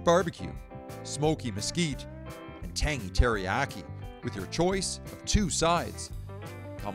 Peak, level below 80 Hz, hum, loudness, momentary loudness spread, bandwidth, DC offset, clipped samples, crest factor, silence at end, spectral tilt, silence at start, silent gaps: -10 dBFS; -38 dBFS; none; -30 LUFS; 16 LU; 16.5 kHz; under 0.1%; under 0.1%; 20 dB; 0 s; -4.5 dB/octave; 0 s; none